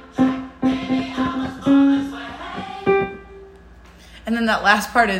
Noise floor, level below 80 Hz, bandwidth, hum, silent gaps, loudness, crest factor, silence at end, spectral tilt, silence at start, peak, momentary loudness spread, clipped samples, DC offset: -44 dBFS; -46 dBFS; 16 kHz; none; none; -20 LUFS; 20 dB; 0 s; -5 dB/octave; 0 s; 0 dBFS; 15 LU; under 0.1%; under 0.1%